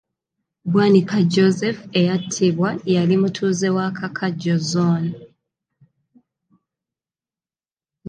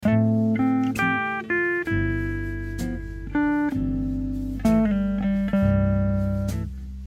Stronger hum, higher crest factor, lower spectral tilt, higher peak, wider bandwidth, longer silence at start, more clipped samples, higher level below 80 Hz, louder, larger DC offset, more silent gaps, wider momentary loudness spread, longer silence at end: neither; about the same, 18 dB vs 14 dB; second, -6 dB/octave vs -8 dB/octave; first, -4 dBFS vs -10 dBFS; second, 9.4 kHz vs 15 kHz; first, 0.65 s vs 0 s; neither; second, -66 dBFS vs -34 dBFS; first, -19 LUFS vs -24 LUFS; neither; neither; about the same, 9 LU vs 9 LU; about the same, 0 s vs 0 s